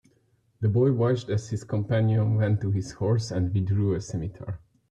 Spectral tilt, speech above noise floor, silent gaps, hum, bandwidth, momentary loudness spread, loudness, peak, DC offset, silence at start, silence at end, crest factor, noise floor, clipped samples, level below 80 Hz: -8 dB/octave; 41 dB; none; none; 8.8 kHz; 11 LU; -26 LUFS; -12 dBFS; under 0.1%; 0.6 s; 0.35 s; 14 dB; -66 dBFS; under 0.1%; -54 dBFS